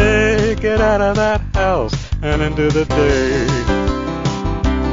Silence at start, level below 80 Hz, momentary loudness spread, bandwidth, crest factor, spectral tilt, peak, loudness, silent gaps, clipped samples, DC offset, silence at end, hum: 0 s; -24 dBFS; 6 LU; 7.6 kHz; 14 dB; -6 dB/octave; -2 dBFS; -16 LUFS; none; under 0.1%; 1%; 0 s; none